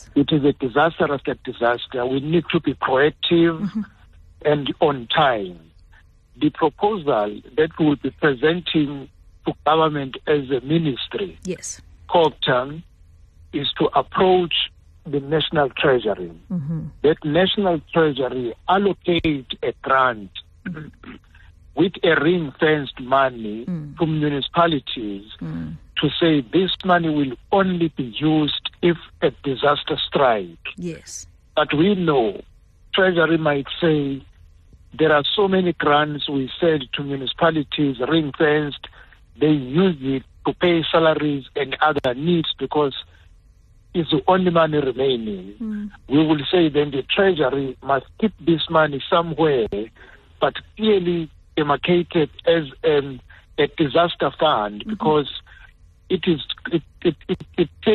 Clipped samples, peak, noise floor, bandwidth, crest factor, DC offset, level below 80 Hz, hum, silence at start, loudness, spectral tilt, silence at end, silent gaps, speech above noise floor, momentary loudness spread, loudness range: under 0.1%; -4 dBFS; -51 dBFS; 10 kHz; 16 dB; under 0.1%; -48 dBFS; none; 0 s; -20 LUFS; -6 dB/octave; 0 s; none; 31 dB; 12 LU; 3 LU